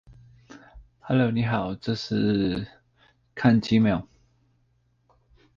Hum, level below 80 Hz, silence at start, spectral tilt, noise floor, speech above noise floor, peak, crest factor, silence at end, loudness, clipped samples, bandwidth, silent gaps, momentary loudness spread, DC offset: none; -52 dBFS; 0.5 s; -7.5 dB/octave; -67 dBFS; 44 dB; -8 dBFS; 18 dB; 1.55 s; -24 LUFS; under 0.1%; 7.2 kHz; none; 10 LU; under 0.1%